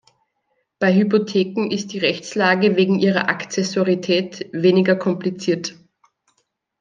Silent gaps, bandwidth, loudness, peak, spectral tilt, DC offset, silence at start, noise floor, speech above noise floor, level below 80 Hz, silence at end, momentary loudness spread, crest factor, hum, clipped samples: none; 7.6 kHz; -19 LUFS; -2 dBFS; -5.5 dB/octave; under 0.1%; 0.8 s; -71 dBFS; 52 dB; -68 dBFS; 1.1 s; 7 LU; 18 dB; none; under 0.1%